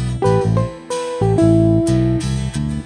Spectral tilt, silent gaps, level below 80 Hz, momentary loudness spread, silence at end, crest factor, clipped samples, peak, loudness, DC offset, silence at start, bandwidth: -7.5 dB/octave; none; -30 dBFS; 10 LU; 0 s; 12 dB; under 0.1%; -4 dBFS; -17 LUFS; under 0.1%; 0 s; 10 kHz